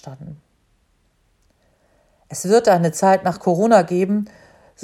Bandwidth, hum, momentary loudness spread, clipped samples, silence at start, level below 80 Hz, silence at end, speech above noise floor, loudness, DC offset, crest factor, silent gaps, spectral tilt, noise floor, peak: 15.5 kHz; none; 21 LU; under 0.1%; 0.05 s; -60 dBFS; 0.55 s; 45 dB; -17 LUFS; under 0.1%; 20 dB; none; -6 dB/octave; -62 dBFS; 0 dBFS